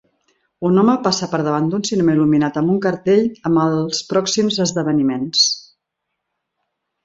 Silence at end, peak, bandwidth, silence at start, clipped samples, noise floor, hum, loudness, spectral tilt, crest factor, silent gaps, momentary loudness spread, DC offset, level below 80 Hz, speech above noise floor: 1.45 s; -2 dBFS; 7.8 kHz; 0.6 s; under 0.1%; -78 dBFS; none; -17 LUFS; -4.5 dB/octave; 16 dB; none; 4 LU; under 0.1%; -58 dBFS; 61 dB